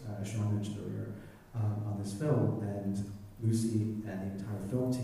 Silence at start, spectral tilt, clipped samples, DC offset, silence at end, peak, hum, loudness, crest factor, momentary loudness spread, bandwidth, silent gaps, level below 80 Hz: 0 s; -7.5 dB/octave; under 0.1%; under 0.1%; 0 s; -16 dBFS; none; -35 LUFS; 18 dB; 10 LU; 14.5 kHz; none; -60 dBFS